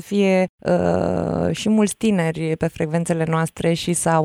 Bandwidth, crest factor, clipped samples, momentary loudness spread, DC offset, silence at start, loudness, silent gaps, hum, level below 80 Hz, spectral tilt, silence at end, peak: 15 kHz; 14 dB; under 0.1%; 4 LU; under 0.1%; 0 s; -20 LUFS; 0.49-0.58 s; none; -48 dBFS; -5.5 dB/octave; 0 s; -6 dBFS